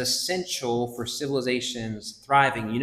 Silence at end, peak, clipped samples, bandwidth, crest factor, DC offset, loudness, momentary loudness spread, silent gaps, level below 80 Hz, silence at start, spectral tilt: 0 s; -6 dBFS; under 0.1%; 16 kHz; 20 dB; under 0.1%; -26 LUFS; 11 LU; none; -58 dBFS; 0 s; -3.5 dB/octave